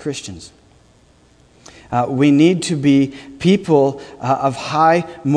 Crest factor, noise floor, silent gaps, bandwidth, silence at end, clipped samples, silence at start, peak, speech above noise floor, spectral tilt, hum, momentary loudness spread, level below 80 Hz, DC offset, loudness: 16 dB; -51 dBFS; none; 10.5 kHz; 0 s; under 0.1%; 0 s; 0 dBFS; 35 dB; -6.5 dB/octave; none; 13 LU; -52 dBFS; under 0.1%; -16 LUFS